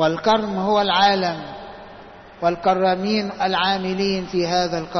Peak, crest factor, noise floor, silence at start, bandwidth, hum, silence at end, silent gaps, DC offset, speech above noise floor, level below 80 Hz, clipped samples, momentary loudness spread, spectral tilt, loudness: -6 dBFS; 16 dB; -42 dBFS; 0 s; 6.4 kHz; none; 0 s; none; under 0.1%; 22 dB; -52 dBFS; under 0.1%; 17 LU; -5 dB/octave; -20 LUFS